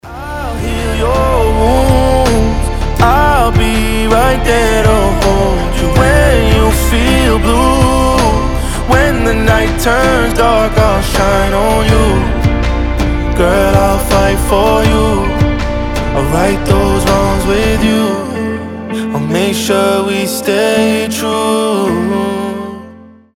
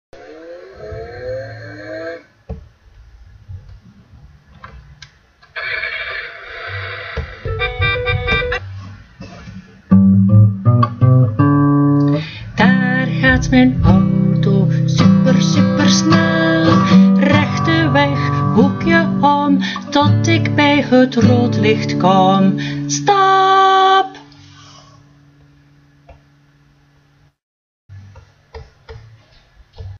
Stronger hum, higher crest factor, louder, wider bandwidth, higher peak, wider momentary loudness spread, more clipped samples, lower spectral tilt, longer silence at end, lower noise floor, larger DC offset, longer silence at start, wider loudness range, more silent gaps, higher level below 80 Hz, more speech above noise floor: neither; about the same, 10 dB vs 14 dB; about the same, -11 LUFS vs -13 LUFS; first, 17 kHz vs 7.2 kHz; about the same, 0 dBFS vs 0 dBFS; second, 7 LU vs 19 LU; neither; about the same, -5.5 dB/octave vs -6 dB/octave; first, 0.35 s vs 0 s; second, -35 dBFS vs -53 dBFS; neither; second, 0.05 s vs 0.2 s; second, 3 LU vs 17 LU; second, none vs 27.43-27.89 s; first, -16 dBFS vs -36 dBFS; second, 25 dB vs 41 dB